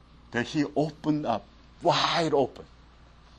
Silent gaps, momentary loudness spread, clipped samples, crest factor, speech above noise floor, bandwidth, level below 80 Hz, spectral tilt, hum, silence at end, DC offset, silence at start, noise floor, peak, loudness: none; 8 LU; under 0.1%; 18 dB; 27 dB; 9.4 kHz; -56 dBFS; -5 dB/octave; none; 0.75 s; under 0.1%; 0.3 s; -54 dBFS; -10 dBFS; -27 LUFS